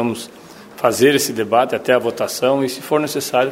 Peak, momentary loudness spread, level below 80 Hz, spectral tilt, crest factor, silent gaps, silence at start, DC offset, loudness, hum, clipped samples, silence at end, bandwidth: 0 dBFS; 7 LU; -62 dBFS; -4 dB/octave; 18 dB; none; 0 s; under 0.1%; -17 LUFS; none; under 0.1%; 0 s; 16.5 kHz